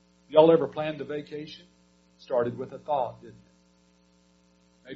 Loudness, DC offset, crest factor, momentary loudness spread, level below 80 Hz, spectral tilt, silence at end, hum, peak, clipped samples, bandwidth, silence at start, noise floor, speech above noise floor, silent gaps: -26 LUFS; under 0.1%; 24 dB; 20 LU; -68 dBFS; -5 dB/octave; 0 s; none; -4 dBFS; under 0.1%; 6.6 kHz; 0.3 s; -63 dBFS; 35 dB; none